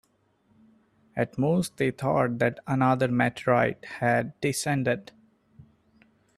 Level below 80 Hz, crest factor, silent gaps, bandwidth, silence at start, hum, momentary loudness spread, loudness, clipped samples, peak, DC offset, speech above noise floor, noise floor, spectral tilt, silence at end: -62 dBFS; 18 dB; none; 14 kHz; 1.15 s; none; 5 LU; -26 LUFS; under 0.1%; -8 dBFS; under 0.1%; 41 dB; -67 dBFS; -6 dB/octave; 0.75 s